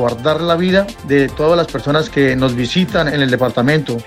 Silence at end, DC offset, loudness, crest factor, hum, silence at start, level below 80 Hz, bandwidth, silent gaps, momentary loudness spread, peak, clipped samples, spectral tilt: 0 s; under 0.1%; -15 LUFS; 14 dB; none; 0 s; -38 dBFS; 16 kHz; none; 3 LU; 0 dBFS; under 0.1%; -6 dB/octave